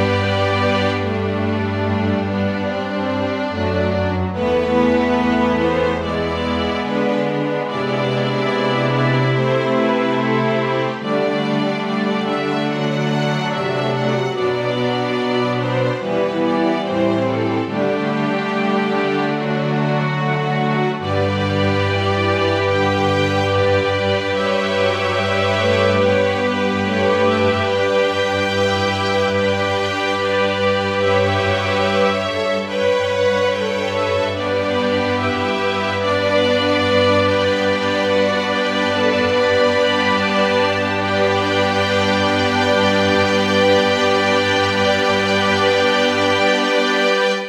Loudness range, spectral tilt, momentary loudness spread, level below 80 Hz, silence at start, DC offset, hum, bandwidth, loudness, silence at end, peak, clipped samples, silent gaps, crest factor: 4 LU; -5.5 dB/octave; 5 LU; -48 dBFS; 0 s; under 0.1%; none; 12.5 kHz; -17 LUFS; 0 s; -4 dBFS; under 0.1%; none; 14 dB